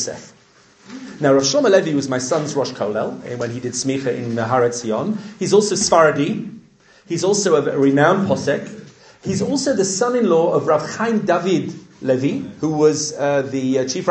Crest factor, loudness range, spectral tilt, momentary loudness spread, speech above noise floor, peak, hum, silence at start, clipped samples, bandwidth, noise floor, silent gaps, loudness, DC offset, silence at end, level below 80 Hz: 18 dB; 3 LU; -4.5 dB/octave; 12 LU; 33 dB; 0 dBFS; none; 0 s; under 0.1%; 9 kHz; -51 dBFS; none; -18 LUFS; under 0.1%; 0 s; -60 dBFS